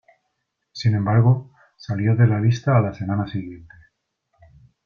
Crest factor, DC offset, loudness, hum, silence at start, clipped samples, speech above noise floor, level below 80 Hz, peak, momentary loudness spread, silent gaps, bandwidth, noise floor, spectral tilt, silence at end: 18 dB; under 0.1%; -20 LUFS; none; 0.75 s; under 0.1%; 57 dB; -54 dBFS; -4 dBFS; 15 LU; none; 6.8 kHz; -76 dBFS; -8 dB/octave; 1.25 s